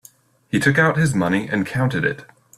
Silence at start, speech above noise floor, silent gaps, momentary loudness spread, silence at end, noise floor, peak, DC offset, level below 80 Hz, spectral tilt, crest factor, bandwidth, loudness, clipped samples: 0.55 s; 32 dB; none; 8 LU; 0.35 s; -51 dBFS; -2 dBFS; under 0.1%; -52 dBFS; -6 dB/octave; 18 dB; 14.5 kHz; -19 LUFS; under 0.1%